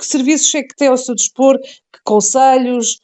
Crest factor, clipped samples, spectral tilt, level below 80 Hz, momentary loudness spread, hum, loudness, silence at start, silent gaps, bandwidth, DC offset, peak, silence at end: 14 dB; under 0.1%; -2 dB/octave; -70 dBFS; 6 LU; none; -13 LUFS; 0 s; none; 9 kHz; under 0.1%; 0 dBFS; 0.1 s